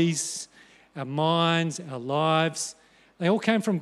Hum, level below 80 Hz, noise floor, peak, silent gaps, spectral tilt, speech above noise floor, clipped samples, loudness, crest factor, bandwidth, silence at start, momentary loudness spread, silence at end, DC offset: none; -76 dBFS; -55 dBFS; -6 dBFS; none; -4.5 dB/octave; 30 dB; under 0.1%; -26 LUFS; 20 dB; 13.5 kHz; 0 s; 13 LU; 0 s; under 0.1%